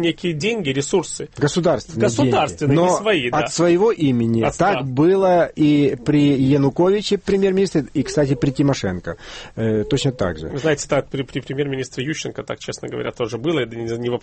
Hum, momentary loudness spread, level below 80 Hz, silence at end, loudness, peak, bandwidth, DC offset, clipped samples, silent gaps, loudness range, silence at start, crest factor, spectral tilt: none; 11 LU; -44 dBFS; 0.05 s; -19 LUFS; -4 dBFS; 8.8 kHz; under 0.1%; under 0.1%; none; 7 LU; 0 s; 14 dB; -6 dB/octave